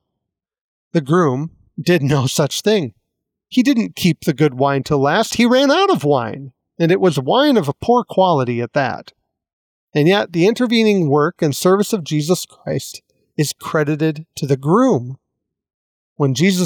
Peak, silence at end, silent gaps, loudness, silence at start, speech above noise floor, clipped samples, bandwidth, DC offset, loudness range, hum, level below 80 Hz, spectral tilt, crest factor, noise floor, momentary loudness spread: -4 dBFS; 0 s; 9.53-9.87 s, 15.74-16.16 s; -16 LUFS; 0.95 s; 64 dB; under 0.1%; 19 kHz; under 0.1%; 4 LU; none; -56 dBFS; -5.5 dB/octave; 14 dB; -80 dBFS; 10 LU